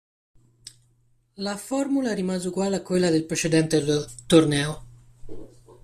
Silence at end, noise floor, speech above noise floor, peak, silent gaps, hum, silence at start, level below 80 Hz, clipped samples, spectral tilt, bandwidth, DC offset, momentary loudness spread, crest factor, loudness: 0.1 s; -63 dBFS; 41 dB; -4 dBFS; none; none; 0.65 s; -52 dBFS; under 0.1%; -5 dB/octave; 15 kHz; under 0.1%; 13 LU; 22 dB; -23 LUFS